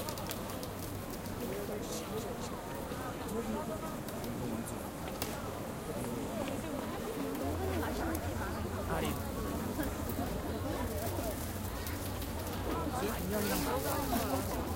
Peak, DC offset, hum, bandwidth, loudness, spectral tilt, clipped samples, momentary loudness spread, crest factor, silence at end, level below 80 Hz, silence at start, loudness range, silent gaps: -14 dBFS; under 0.1%; none; 17 kHz; -38 LUFS; -5 dB/octave; under 0.1%; 7 LU; 22 dB; 0 s; -48 dBFS; 0 s; 3 LU; none